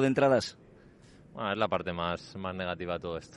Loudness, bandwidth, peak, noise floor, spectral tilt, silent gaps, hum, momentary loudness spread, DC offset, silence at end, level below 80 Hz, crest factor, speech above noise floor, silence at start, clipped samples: -31 LUFS; 11.5 kHz; -14 dBFS; -56 dBFS; -6 dB/octave; none; none; 12 LU; under 0.1%; 0 s; -64 dBFS; 18 dB; 25 dB; 0 s; under 0.1%